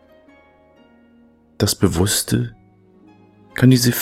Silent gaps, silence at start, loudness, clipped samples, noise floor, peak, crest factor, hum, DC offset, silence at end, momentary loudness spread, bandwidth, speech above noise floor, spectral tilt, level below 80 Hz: none; 1.6 s; -17 LUFS; under 0.1%; -52 dBFS; 0 dBFS; 20 dB; none; under 0.1%; 0 s; 12 LU; 16.5 kHz; 36 dB; -5 dB/octave; -44 dBFS